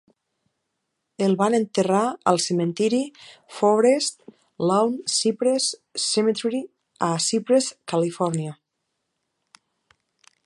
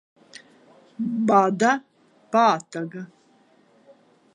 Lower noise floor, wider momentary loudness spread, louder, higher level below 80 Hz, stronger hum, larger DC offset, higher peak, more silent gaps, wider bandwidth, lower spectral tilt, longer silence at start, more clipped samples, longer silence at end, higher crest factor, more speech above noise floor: first, -78 dBFS vs -59 dBFS; second, 8 LU vs 16 LU; about the same, -22 LUFS vs -22 LUFS; first, -74 dBFS vs -80 dBFS; neither; neither; about the same, -2 dBFS vs -4 dBFS; neither; about the same, 11.5 kHz vs 11 kHz; second, -4 dB/octave vs -5.5 dB/octave; first, 1.2 s vs 1 s; neither; first, 1.95 s vs 1.3 s; about the same, 20 dB vs 22 dB; first, 56 dB vs 38 dB